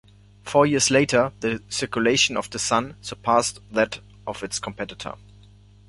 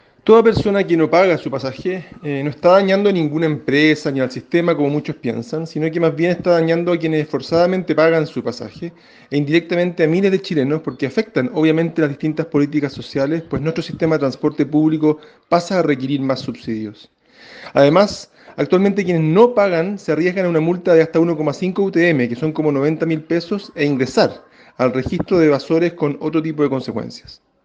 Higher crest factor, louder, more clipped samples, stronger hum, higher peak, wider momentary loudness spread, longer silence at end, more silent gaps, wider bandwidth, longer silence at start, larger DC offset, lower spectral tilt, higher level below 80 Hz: about the same, 20 dB vs 16 dB; second, -22 LUFS vs -17 LUFS; neither; first, 50 Hz at -45 dBFS vs none; second, -4 dBFS vs 0 dBFS; first, 16 LU vs 11 LU; first, 0.7 s vs 0.3 s; neither; first, 11.5 kHz vs 8.2 kHz; first, 0.45 s vs 0.25 s; neither; second, -3 dB/octave vs -7 dB/octave; about the same, -52 dBFS vs -52 dBFS